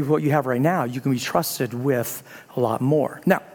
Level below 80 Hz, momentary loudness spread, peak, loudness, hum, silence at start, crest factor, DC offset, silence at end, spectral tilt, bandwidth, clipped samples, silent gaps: -64 dBFS; 5 LU; -2 dBFS; -22 LUFS; none; 0 s; 20 dB; under 0.1%; 0 s; -6 dB/octave; 18 kHz; under 0.1%; none